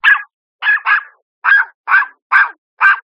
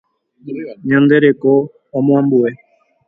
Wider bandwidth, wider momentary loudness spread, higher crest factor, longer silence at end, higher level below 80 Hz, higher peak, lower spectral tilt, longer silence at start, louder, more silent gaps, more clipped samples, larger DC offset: first, 6.6 kHz vs 3.8 kHz; second, 5 LU vs 16 LU; about the same, 14 dB vs 14 dB; second, 0.1 s vs 0.55 s; second, -78 dBFS vs -60 dBFS; about the same, 0 dBFS vs 0 dBFS; second, 2.5 dB/octave vs -10.5 dB/octave; second, 0.05 s vs 0.45 s; about the same, -13 LUFS vs -14 LUFS; first, 0.33-0.59 s, 1.22-1.42 s, 1.74-1.84 s, 2.22-2.30 s, 2.58-2.77 s vs none; neither; neither